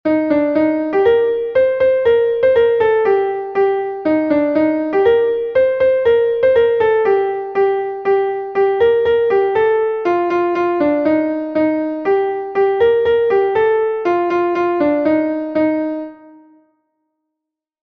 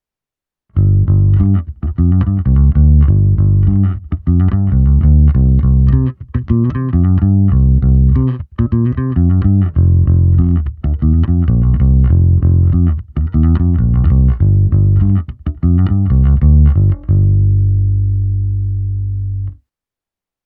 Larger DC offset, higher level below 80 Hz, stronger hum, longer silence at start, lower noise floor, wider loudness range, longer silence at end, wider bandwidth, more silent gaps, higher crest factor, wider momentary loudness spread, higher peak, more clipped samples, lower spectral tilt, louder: neither; second, -52 dBFS vs -16 dBFS; second, none vs 50 Hz at -30 dBFS; second, 0.05 s vs 0.75 s; second, -82 dBFS vs -88 dBFS; about the same, 2 LU vs 1 LU; first, 1.7 s vs 0.9 s; first, 5.6 kHz vs 3.1 kHz; neither; about the same, 12 dB vs 10 dB; second, 4 LU vs 8 LU; about the same, -2 dBFS vs 0 dBFS; neither; second, -7.5 dB/octave vs -13.5 dB/octave; about the same, -15 LUFS vs -13 LUFS